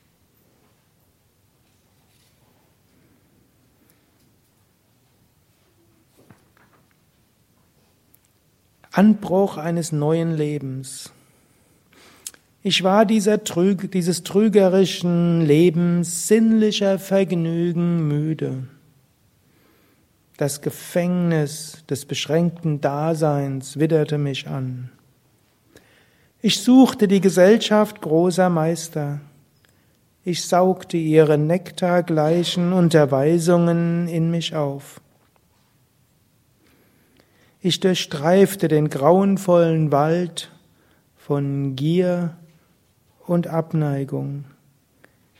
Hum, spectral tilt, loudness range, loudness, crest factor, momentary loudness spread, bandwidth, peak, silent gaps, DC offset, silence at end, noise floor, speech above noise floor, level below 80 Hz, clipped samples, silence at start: none; -6 dB/octave; 9 LU; -19 LUFS; 20 dB; 13 LU; 16 kHz; 0 dBFS; none; under 0.1%; 0.95 s; -61 dBFS; 43 dB; -64 dBFS; under 0.1%; 8.95 s